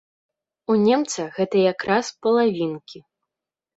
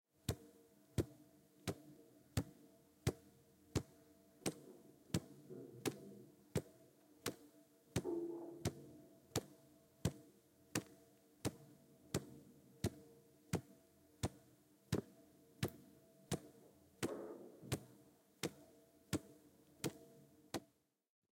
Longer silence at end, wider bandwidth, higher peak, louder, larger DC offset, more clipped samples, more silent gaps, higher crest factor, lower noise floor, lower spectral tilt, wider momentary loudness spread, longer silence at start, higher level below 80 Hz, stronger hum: about the same, 0.8 s vs 0.7 s; second, 8.2 kHz vs 16.5 kHz; first, -4 dBFS vs -20 dBFS; first, -21 LUFS vs -47 LUFS; neither; neither; neither; second, 18 dB vs 30 dB; first, -87 dBFS vs -76 dBFS; about the same, -5 dB/octave vs -5 dB/octave; second, 9 LU vs 22 LU; first, 0.7 s vs 0.3 s; about the same, -66 dBFS vs -68 dBFS; neither